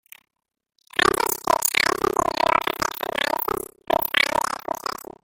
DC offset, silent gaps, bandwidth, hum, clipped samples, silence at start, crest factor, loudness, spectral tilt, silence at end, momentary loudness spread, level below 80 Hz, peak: under 0.1%; none; 17 kHz; none; under 0.1%; 1 s; 22 dB; -22 LUFS; -1.5 dB/octave; 0.3 s; 9 LU; -52 dBFS; -2 dBFS